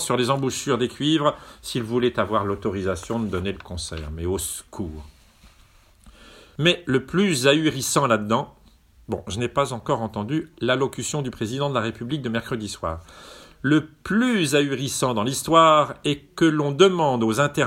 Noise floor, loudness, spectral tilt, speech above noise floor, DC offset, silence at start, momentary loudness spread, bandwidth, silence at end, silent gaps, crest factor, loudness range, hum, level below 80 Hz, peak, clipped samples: -54 dBFS; -22 LUFS; -4.5 dB/octave; 32 dB; under 0.1%; 0 s; 13 LU; 16.5 kHz; 0 s; none; 22 dB; 8 LU; none; -48 dBFS; 0 dBFS; under 0.1%